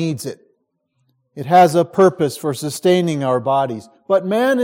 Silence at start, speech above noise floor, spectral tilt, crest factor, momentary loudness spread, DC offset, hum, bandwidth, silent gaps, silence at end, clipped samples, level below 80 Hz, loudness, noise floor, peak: 0 s; 52 dB; -6 dB/octave; 16 dB; 14 LU; under 0.1%; none; 16.5 kHz; none; 0 s; under 0.1%; -64 dBFS; -17 LUFS; -68 dBFS; 0 dBFS